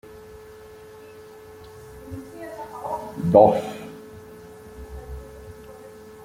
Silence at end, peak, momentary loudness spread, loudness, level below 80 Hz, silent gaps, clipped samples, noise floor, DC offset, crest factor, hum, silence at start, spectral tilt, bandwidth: 0 s; -2 dBFS; 26 LU; -20 LUFS; -48 dBFS; none; under 0.1%; -44 dBFS; under 0.1%; 24 dB; none; 0.05 s; -7.5 dB/octave; 16 kHz